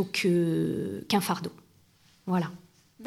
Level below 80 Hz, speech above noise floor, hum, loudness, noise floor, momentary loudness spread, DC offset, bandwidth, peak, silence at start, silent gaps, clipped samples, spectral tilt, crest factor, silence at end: -68 dBFS; 34 dB; none; -28 LUFS; -62 dBFS; 13 LU; under 0.1%; 16 kHz; -12 dBFS; 0 s; none; under 0.1%; -5.5 dB/octave; 18 dB; 0 s